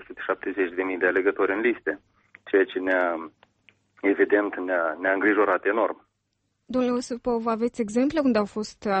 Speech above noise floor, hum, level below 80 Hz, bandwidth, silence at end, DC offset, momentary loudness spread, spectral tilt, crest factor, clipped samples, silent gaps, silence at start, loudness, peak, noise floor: 51 dB; none; -62 dBFS; 8.4 kHz; 0 s; under 0.1%; 9 LU; -5.5 dB/octave; 16 dB; under 0.1%; none; 0 s; -25 LUFS; -8 dBFS; -75 dBFS